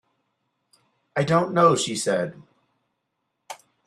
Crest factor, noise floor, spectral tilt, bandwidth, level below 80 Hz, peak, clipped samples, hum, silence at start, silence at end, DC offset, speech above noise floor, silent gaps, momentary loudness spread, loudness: 20 dB; -78 dBFS; -4.5 dB/octave; 13.5 kHz; -66 dBFS; -6 dBFS; under 0.1%; none; 1.15 s; 0.3 s; under 0.1%; 56 dB; none; 24 LU; -22 LUFS